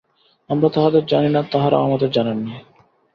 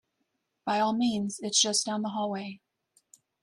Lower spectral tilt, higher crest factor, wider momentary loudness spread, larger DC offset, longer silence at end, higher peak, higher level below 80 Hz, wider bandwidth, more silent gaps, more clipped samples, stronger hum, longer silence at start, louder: first, -9 dB/octave vs -2.5 dB/octave; second, 16 dB vs 22 dB; second, 10 LU vs 13 LU; neither; second, 0.55 s vs 0.85 s; first, -2 dBFS vs -10 dBFS; first, -58 dBFS vs -72 dBFS; second, 6.2 kHz vs 13 kHz; neither; neither; neither; second, 0.5 s vs 0.65 s; first, -18 LUFS vs -28 LUFS